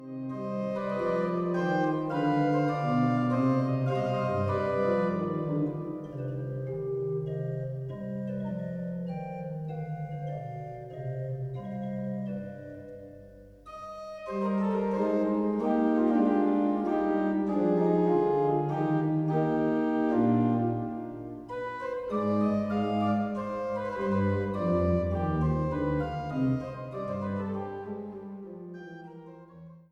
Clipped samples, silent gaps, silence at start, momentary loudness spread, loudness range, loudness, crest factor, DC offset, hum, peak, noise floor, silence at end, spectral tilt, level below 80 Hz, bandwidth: under 0.1%; none; 0 s; 15 LU; 10 LU; -29 LUFS; 16 dB; under 0.1%; none; -14 dBFS; -50 dBFS; 0.1 s; -9.5 dB/octave; -52 dBFS; 8.2 kHz